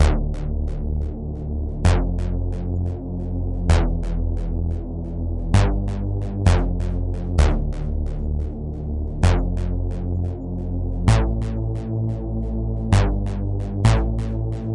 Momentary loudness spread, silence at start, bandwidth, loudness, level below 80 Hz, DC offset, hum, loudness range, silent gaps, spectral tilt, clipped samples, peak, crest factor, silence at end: 8 LU; 0 s; 11 kHz; -24 LUFS; -24 dBFS; under 0.1%; none; 2 LU; none; -7 dB/octave; under 0.1%; -4 dBFS; 18 dB; 0 s